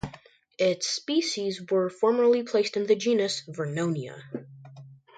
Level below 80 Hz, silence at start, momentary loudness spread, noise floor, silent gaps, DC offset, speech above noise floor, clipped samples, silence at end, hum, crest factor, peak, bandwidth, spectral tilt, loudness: -62 dBFS; 0.05 s; 15 LU; -53 dBFS; none; under 0.1%; 27 dB; under 0.1%; 0.2 s; none; 16 dB; -10 dBFS; 9.2 kHz; -4.5 dB/octave; -26 LUFS